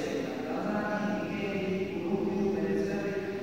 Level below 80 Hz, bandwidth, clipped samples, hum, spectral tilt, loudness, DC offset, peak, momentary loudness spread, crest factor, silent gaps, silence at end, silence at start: -60 dBFS; 16 kHz; under 0.1%; none; -6.5 dB/octave; -32 LUFS; 0.1%; -18 dBFS; 4 LU; 14 dB; none; 0 s; 0 s